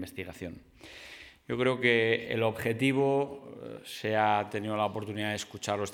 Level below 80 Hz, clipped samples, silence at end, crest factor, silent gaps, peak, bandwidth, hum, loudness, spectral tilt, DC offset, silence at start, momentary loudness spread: -66 dBFS; under 0.1%; 0 s; 20 dB; none; -10 dBFS; 18 kHz; none; -29 LUFS; -5 dB/octave; under 0.1%; 0 s; 20 LU